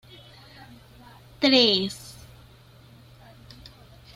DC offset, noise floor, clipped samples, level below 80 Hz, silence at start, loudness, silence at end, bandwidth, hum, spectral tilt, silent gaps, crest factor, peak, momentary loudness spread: under 0.1%; -51 dBFS; under 0.1%; -58 dBFS; 1.4 s; -20 LUFS; 2.05 s; 15.5 kHz; none; -4 dB/octave; none; 22 dB; -6 dBFS; 29 LU